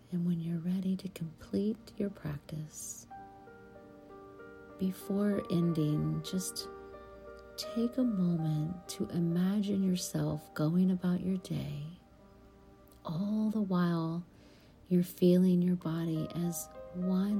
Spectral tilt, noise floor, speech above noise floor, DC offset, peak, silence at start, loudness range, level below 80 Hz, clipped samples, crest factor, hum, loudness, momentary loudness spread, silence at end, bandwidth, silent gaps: -7 dB/octave; -58 dBFS; 26 dB; under 0.1%; -16 dBFS; 0.1 s; 8 LU; -62 dBFS; under 0.1%; 18 dB; none; -33 LUFS; 21 LU; 0 s; 16.5 kHz; none